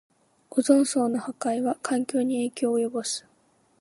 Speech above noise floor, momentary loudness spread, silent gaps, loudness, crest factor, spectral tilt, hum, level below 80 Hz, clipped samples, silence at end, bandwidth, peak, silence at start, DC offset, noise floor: 40 dB; 9 LU; none; -26 LUFS; 20 dB; -3.5 dB/octave; none; -80 dBFS; under 0.1%; 0.6 s; 11.5 kHz; -6 dBFS; 0.5 s; under 0.1%; -64 dBFS